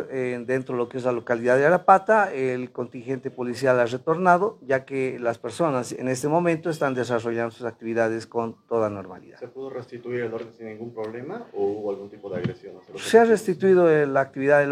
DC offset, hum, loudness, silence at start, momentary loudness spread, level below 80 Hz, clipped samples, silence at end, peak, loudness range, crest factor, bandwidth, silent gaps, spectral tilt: under 0.1%; none; -23 LUFS; 0 s; 17 LU; -70 dBFS; under 0.1%; 0 s; -2 dBFS; 10 LU; 22 dB; 14.5 kHz; none; -6 dB/octave